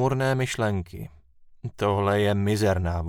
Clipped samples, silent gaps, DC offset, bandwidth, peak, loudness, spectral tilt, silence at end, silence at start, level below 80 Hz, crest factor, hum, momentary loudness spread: under 0.1%; none; under 0.1%; 16.5 kHz; -10 dBFS; -24 LUFS; -6 dB/octave; 0 s; 0 s; -44 dBFS; 16 dB; none; 17 LU